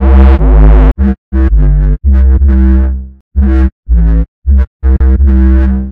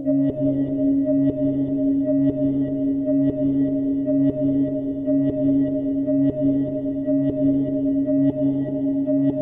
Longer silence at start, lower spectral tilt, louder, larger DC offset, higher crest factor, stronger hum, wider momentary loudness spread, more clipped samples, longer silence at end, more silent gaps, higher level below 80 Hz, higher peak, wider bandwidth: about the same, 0 s vs 0 s; second, -11 dB/octave vs -12.5 dB/octave; first, -9 LUFS vs -21 LUFS; neither; second, 6 dB vs 12 dB; neither; first, 6 LU vs 3 LU; first, 2% vs under 0.1%; about the same, 0 s vs 0 s; first, 1.18-1.32 s, 3.21-3.31 s, 3.72-3.83 s, 4.28-4.42 s, 4.67-4.80 s vs none; first, -6 dBFS vs -48 dBFS; first, 0 dBFS vs -10 dBFS; about the same, 3.1 kHz vs 3.1 kHz